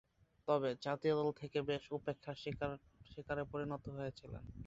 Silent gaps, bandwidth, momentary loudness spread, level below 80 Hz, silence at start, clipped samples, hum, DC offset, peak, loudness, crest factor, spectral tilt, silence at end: none; 7.8 kHz; 15 LU; -64 dBFS; 0.45 s; under 0.1%; none; under 0.1%; -20 dBFS; -41 LUFS; 20 dB; -5 dB/octave; 0 s